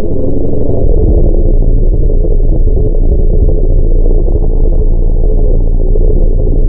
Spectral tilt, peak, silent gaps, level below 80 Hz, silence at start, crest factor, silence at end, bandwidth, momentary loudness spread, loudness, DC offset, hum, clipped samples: -17.5 dB/octave; 0 dBFS; none; -6 dBFS; 0 s; 6 dB; 0 s; 1 kHz; 3 LU; -13 LUFS; under 0.1%; none; under 0.1%